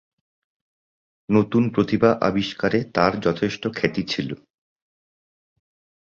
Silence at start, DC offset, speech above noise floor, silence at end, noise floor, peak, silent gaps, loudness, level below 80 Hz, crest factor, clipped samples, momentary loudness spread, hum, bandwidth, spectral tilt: 1.3 s; under 0.1%; over 69 dB; 1.75 s; under -90 dBFS; -2 dBFS; none; -21 LUFS; -54 dBFS; 22 dB; under 0.1%; 8 LU; none; 7.4 kHz; -6.5 dB/octave